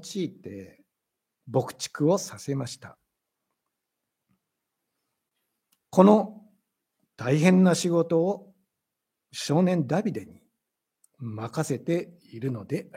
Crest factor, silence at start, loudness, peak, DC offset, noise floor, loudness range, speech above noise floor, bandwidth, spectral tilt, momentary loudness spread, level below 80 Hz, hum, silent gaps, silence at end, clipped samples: 24 dB; 0 s; -25 LUFS; -2 dBFS; under 0.1%; -85 dBFS; 9 LU; 60 dB; 15.5 kHz; -6.5 dB/octave; 20 LU; -74 dBFS; none; none; 0.15 s; under 0.1%